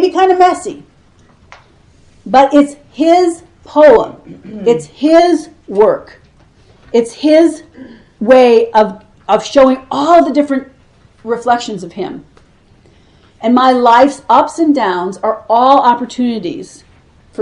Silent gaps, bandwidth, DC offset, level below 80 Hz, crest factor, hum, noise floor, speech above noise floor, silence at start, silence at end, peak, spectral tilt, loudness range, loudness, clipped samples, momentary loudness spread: none; 11 kHz; under 0.1%; -48 dBFS; 12 dB; none; -46 dBFS; 36 dB; 0 s; 0 s; 0 dBFS; -5 dB/octave; 4 LU; -11 LUFS; 0.3%; 16 LU